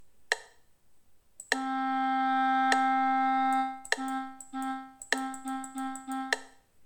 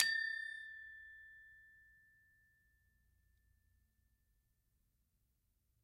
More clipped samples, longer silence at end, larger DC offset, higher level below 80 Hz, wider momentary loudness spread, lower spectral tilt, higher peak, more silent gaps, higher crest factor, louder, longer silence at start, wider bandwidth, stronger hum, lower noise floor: neither; second, 0 s vs 4.1 s; neither; first, -72 dBFS vs -80 dBFS; second, 12 LU vs 24 LU; first, -1 dB/octave vs 2 dB/octave; about the same, -10 dBFS vs -12 dBFS; neither; second, 22 dB vs 36 dB; first, -30 LUFS vs -42 LUFS; about the same, 0 s vs 0 s; first, 19 kHz vs 15.5 kHz; neither; second, -59 dBFS vs -81 dBFS